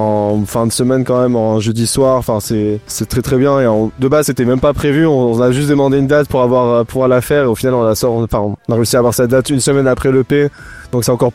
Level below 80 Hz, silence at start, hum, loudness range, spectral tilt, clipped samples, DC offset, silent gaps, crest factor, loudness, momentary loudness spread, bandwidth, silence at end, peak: -36 dBFS; 0 s; none; 2 LU; -6 dB/octave; under 0.1%; under 0.1%; none; 10 dB; -13 LUFS; 5 LU; 16.5 kHz; 0 s; -2 dBFS